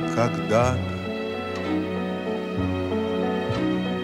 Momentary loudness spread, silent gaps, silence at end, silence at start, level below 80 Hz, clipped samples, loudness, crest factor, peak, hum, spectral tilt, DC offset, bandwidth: 8 LU; none; 0 s; 0 s; -50 dBFS; under 0.1%; -25 LUFS; 16 dB; -8 dBFS; none; -6.5 dB/octave; under 0.1%; 15 kHz